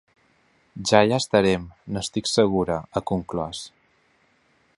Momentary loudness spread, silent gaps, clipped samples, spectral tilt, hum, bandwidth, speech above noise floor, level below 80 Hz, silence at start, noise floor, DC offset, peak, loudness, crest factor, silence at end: 14 LU; none; under 0.1%; -4.5 dB/octave; none; 11.5 kHz; 41 dB; -50 dBFS; 0.75 s; -63 dBFS; under 0.1%; 0 dBFS; -23 LUFS; 24 dB; 1.1 s